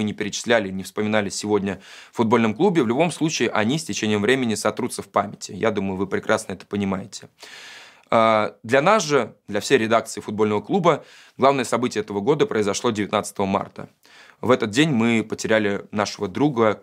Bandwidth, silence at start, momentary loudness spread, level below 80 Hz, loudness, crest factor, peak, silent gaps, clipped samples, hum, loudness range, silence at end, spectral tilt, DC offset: 15.5 kHz; 0 s; 11 LU; -66 dBFS; -21 LUFS; 20 dB; -2 dBFS; none; under 0.1%; none; 3 LU; 0.05 s; -5 dB/octave; under 0.1%